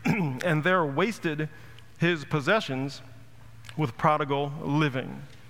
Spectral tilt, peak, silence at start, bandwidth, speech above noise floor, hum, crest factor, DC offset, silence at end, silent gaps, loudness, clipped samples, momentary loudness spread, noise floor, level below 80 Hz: -6.5 dB/octave; -8 dBFS; 0 s; 16 kHz; 23 dB; none; 20 dB; 0.4%; 0 s; none; -27 LUFS; under 0.1%; 12 LU; -50 dBFS; -60 dBFS